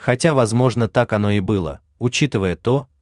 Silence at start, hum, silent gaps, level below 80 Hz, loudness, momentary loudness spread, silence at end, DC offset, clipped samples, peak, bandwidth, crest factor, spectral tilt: 0 s; none; none; -46 dBFS; -19 LUFS; 6 LU; 0.2 s; under 0.1%; under 0.1%; -2 dBFS; 11 kHz; 16 dB; -6 dB/octave